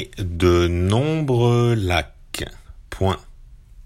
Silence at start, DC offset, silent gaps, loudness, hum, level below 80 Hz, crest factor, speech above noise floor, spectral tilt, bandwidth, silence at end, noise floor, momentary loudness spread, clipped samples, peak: 0 s; under 0.1%; none; -20 LUFS; none; -36 dBFS; 16 dB; 25 dB; -6.5 dB/octave; 16 kHz; 0.05 s; -43 dBFS; 13 LU; under 0.1%; -4 dBFS